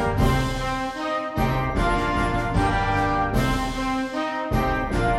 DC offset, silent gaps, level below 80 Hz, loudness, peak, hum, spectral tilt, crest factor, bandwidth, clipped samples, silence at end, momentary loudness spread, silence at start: under 0.1%; none; -30 dBFS; -24 LUFS; -6 dBFS; none; -6 dB/octave; 16 dB; 15.5 kHz; under 0.1%; 0 s; 5 LU; 0 s